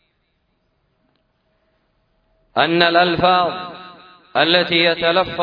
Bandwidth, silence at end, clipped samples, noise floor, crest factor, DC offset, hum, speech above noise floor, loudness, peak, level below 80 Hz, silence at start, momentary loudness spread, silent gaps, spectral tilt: 5.2 kHz; 0 s; under 0.1%; -67 dBFS; 20 dB; under 0.1%; none; 51 dB; -16 LUFS; 0 dBFS; -54 dBFS; 2.55 s; 13 LU; none; -6.5 dB/octave